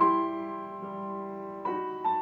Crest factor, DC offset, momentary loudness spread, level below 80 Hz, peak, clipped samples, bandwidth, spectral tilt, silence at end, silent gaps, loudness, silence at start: 18 dB; under 0.1%; 9 LU; -78 dBFS; -12 dBFS; under 0.1%; 4.6 kHz; -8.5 dB/octave; 0 s; none; -33 LUFS; 0 s